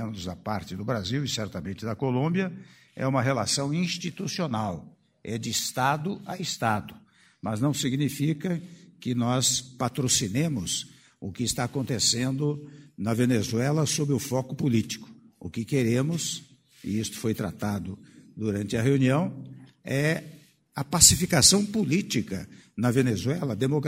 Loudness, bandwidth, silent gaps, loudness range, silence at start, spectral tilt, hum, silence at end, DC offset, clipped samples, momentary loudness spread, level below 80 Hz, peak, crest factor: -26 LUFS; 16 kHz; none; 8 LU; 0 s; -4 dB/octave; none; 0 s; under 0.1%; under 0.1%; 14 LU; -54 dBFS; -2 dBFS; 24 dB